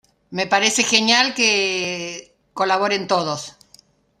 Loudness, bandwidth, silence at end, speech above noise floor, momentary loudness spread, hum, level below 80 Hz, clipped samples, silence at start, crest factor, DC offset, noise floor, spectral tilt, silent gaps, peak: -18 LUFS; 15.5 kHz; 0.7 s; 34 dB; 17 LU; none; -66 dBFS; under 0.1%; 0.3 s; 20 dB; under 0.1%; -53 dBFS; -1.5 dB/octave; none; 0 dBFS